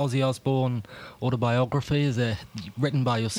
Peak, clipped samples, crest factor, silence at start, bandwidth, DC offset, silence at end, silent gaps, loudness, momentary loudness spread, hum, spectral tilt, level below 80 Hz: -10 dBFS; under 0.1%; 14 dB; 0 s; 12.5 kHz; under 0.1%; 0 s; none; -26 LUFS; 10 LU; none; -6.5 dB/octave; -56 dBFS